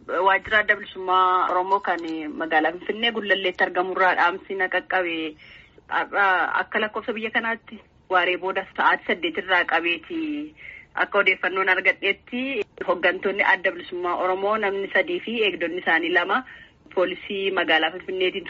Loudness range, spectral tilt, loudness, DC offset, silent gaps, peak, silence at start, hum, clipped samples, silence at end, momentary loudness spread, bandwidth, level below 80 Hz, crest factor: 2 LU; 0 dB/octave; -22 LUFS; under 0.1%; none; -6 dBFS; 0.05 s; none; under 0.1%; 0 s; 9 LU; 7.4 kHz; -62 dBFS; 18 dB